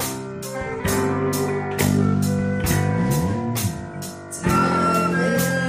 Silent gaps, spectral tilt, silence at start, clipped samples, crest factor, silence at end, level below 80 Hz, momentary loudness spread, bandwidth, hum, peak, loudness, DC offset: none; -5.5 dB/octave; 0 s; under 0.1%; 16 dB; 0 s; -42 dBFS; 11 LU; 15.5 kHz; none; -6 dBFS; -21 LUFS; under 0.1%